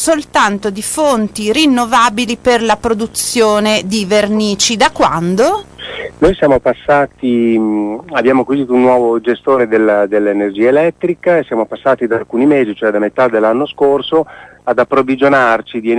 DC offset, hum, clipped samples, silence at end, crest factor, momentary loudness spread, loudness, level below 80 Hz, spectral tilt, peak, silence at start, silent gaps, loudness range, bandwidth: under 0.1%; none; under 0.1%; 0 s; 12 dB; 5 LU; -12 LUFS; -40 dBFS; -4 dB/octave; 0 dBFS; 0 s; none; 1 LU; 11 kHz